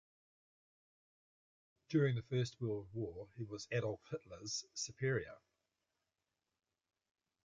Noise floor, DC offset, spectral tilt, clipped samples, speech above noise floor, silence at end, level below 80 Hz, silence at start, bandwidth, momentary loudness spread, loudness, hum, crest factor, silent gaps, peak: under -90 dBFS; under 0.1%; -5.5 dB/octave; under 0.1%; over 50 dB; 2.05 s; -72 dBFS; 1.9 s; 9 kHz; 12 LU; -41 LUFS; none; 22 dB; none; -22 dBFS